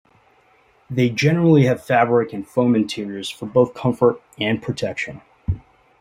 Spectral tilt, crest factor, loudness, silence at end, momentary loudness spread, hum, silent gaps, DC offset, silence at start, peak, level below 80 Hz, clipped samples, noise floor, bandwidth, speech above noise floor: -7 dB/octave; 18 dB; -20 LUFS; 0.4 s; 13 LU; none; none; under 0.1%; 0.9 s; -2 dBFS; -46 dBFS; under 0.1%; -56 dBFS; 15.5 kHz; 38 dB